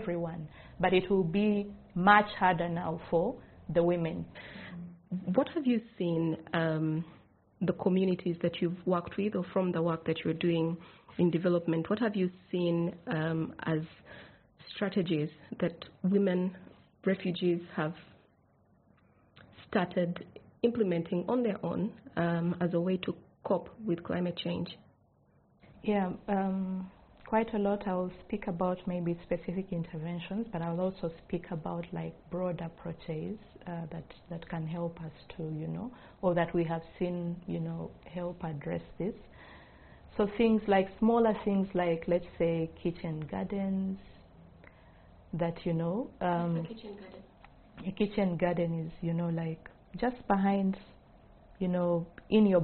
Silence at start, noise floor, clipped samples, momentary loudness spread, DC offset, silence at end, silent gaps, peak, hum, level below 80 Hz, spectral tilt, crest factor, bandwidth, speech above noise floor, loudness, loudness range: 0 s; -67 dBFS; under 0.1%; 14 LU; under 0.1%; 0 s; none; -8 dBFS; none; -60 dBFS; -6 dB/octave; 24 dB; 4.5 kHz; 35 dB; -32 LUFS; 7 LU